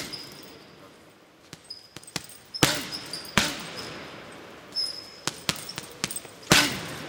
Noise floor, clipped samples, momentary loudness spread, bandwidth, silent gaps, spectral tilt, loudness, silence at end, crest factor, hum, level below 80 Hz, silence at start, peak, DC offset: -54 dBFS; under 0.1%; 23 LU; 18 kHz; none; -2 dB/octave; -27 LUFS; 0 s; 30 dB; none; -54 dBFS; 0 s; 0 dBFS; under 0.1%